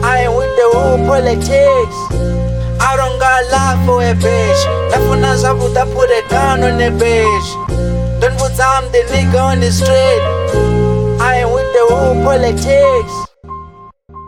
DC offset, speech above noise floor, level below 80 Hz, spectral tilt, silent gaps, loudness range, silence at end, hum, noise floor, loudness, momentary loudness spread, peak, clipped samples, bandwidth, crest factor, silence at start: under 0.1%; 26 dB; -24 dBFS; -5.5 dB/octave; none; 1 LU; 0 s; none; -37 dBFS; -12 LUFS; 7 LU; 0 dBFS; under 0.1%; 17.5 kHz; 10 dB; 0 s